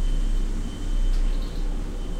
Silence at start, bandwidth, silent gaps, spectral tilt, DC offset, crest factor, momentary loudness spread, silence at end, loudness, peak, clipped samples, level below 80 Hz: 0 s; 9.2 kHz; none; -6 dB/octave; under 0.1%; 8 dB; 5 LU; 0 s; -31 LUFS; -14 dBFS; under 0.1%; -24 dBFS